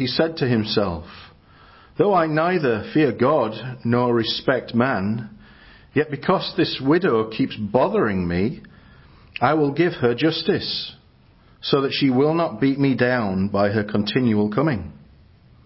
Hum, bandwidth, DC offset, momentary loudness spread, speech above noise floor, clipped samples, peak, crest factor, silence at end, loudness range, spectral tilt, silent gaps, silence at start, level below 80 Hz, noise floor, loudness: none; 5.8 kHz; under 0.1%; 8 LU; 33 dB; under 0.1%; -4 dBFS; 18 dB; 0.7 s; 2 LU; -10.5 dB/octave; none; 0 s; -48 dBFS; -53 dBFS; -21 LUFS